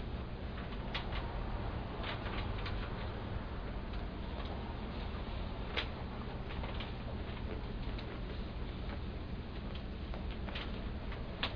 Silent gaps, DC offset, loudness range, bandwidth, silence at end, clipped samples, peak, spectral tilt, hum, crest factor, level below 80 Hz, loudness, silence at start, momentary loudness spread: none; under 0.1%; 2 LU; 5.4 kHz; 0 s; under 0.1%; -20 dBFS; -4.5 dB/octave; none; 20 dB; -44 dBFS; -42 LUFS; 0 s; 4 LU